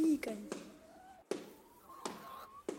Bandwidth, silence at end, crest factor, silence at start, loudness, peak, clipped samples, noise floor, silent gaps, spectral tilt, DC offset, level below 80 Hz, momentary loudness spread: 16 kHz; 0 s; 18 dB; 0 s; -43 LUFS; -22 dBFS; under 0.1%; -59 dBFS; none; -4.5 dB/octave; under 0.1%; -74 dBFS; 20 LU